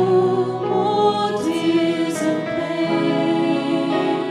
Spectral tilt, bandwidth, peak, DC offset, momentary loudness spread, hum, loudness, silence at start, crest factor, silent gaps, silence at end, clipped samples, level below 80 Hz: -6 dB/octave; 12.5 kHz; -6 dBFS; under 0.1%; 4 LU; none; -20 LUFS; 0 s; 12 dB; none; 0 s; under 0.1%; -64 dBFS